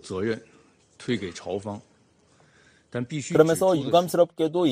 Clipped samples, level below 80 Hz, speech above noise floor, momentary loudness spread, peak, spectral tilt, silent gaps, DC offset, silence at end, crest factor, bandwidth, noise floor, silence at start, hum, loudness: under 0.1%; -64 dBFS; 37 dB; 16 LU; -4 dBFS; -5.5 dB/octave; none; under 0.1%; 0 s; 22 dB; 15.5 kHz; -61 dBFS; 0.05 s; none; -24 LUFS